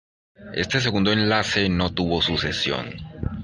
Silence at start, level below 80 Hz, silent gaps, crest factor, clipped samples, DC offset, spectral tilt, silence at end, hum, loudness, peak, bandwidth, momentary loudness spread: 0.4 s; -40 dBFS; none; 20 dB; under 0.1%; under 0.1%; -5 dB/octave; 0 s; none; -22 LUFS; -4 dBFS; 10.5 kHz; 12 LU